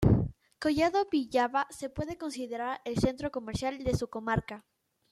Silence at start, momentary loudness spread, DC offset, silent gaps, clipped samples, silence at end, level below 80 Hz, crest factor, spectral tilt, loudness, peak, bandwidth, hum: 0 s; 10 LU; under 0.1%; none; under 0.1%; 0.5 s; -48 dBFS; 20 dB; -6.5 dB/octave; -31 LUFS; -10 dBFS; 13.5 kHz; none